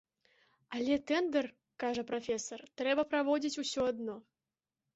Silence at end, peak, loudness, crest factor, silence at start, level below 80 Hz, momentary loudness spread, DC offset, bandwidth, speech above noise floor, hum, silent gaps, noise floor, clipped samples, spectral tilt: 0.75 s; -20 dBFS; -35 LUFS; 16 dB; 0.7 s; -70 dBFS; 12 LU; under 0.1%; 8 kHz; over 56 dB; none; none; under -90 dBFS; under 0.1%; -2 dB/octave